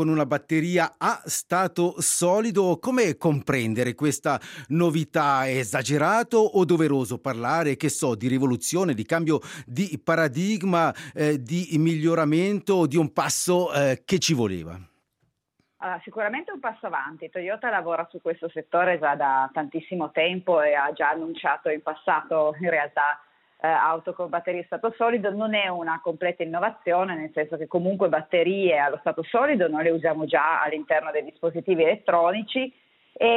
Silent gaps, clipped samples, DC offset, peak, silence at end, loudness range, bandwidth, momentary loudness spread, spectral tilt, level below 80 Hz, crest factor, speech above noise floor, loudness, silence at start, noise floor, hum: none; under 0.1%; under 0.1%; -8 dBFS; 0 s; 4 LU; 16 kHz; 8 LU; -5 dB/octave; -68 dBFS; 16 dB; 49 dB; -24 LUFS; 0 s; -73 dBFS; none